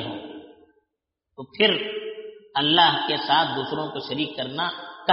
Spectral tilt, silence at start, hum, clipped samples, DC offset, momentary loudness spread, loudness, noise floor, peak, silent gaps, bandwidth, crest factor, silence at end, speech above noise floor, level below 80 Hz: -1 dB/octave; 0 s; none; under 0.1%; under 0.1%; 22 LU; -23 LUFS; -81 dBFS; -4 dBFS; none; 5.8 kHz; 22 dB; 0 s; 57 dB; -68 dBFS